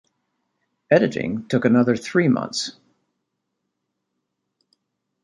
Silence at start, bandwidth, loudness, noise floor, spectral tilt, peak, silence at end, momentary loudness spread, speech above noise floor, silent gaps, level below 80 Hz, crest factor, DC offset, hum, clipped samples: 0.9 s; 11.5 kHz; -20 LUFS; -78 dBFS; -6 dB/octave; -2 dBFS; 2.5 s; 9 LU; 59 dB; none; -62 dBFS; 20 dB; under 0.1%; none; under 0.1%